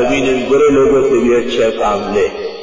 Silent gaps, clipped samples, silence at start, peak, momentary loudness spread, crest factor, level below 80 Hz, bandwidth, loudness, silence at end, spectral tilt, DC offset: none; under 0.1%; 0 s; -4 dBFS; 6 LU; 8 dB; -38 dBFS; 7.6 kHz; -13 LUFS; 0 s; -5 dB/octave; under 0.1%